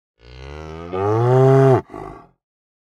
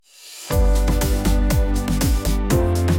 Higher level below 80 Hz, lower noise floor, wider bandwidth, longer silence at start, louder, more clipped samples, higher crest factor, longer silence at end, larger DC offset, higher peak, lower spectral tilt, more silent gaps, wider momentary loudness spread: second, -46 dBFS vs -20 dBFS; about the same, -36 dBFS vs -39 dBFS; second, 7.2 kHz vs 17 kHz; first, 0.4 s vs 0.25 s; first, -15 LUFS vs -20 LUFS; neither; about the same, 16 dB vs 14 dB; first, 0.7 s vs 0 s; neither; about the same, -2 dBFS vs -4 dBFS; first, -9 dB/octave vs -5.5 dB/octave; neither; first, 23 LU vs 4 LU